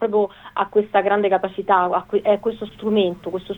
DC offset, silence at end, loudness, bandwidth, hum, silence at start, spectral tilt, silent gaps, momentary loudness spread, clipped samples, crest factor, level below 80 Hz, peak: under 0.1%; 0 s; -20 LUFS; 4 kHz; none; 0 s; -7.5 dB/octave; none; 8 LU; under 0.1%; 16 dB; -56 dBFS; -4 dBFS